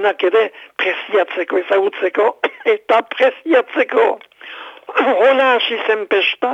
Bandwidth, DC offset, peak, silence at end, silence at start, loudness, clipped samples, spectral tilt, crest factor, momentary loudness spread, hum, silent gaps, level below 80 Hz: 7.8 kHz; under 0.1%; -4 dBFS; 0 s; 0 s; -16 LUFS; under 0.1%; -3.5 dB/octave; 12 dB; 8 LU; none; none; -72 dBFS